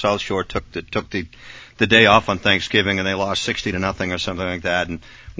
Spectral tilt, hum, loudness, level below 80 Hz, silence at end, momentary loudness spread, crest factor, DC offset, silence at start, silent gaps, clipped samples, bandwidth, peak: -4.5 dB/octave; none; -19 LUFS; -42 dBFS; 0.05 s; 15 LU; 20 dB; under 0.1%; 0 s; none; under 0.1%; 8 kHz; 0 dBFS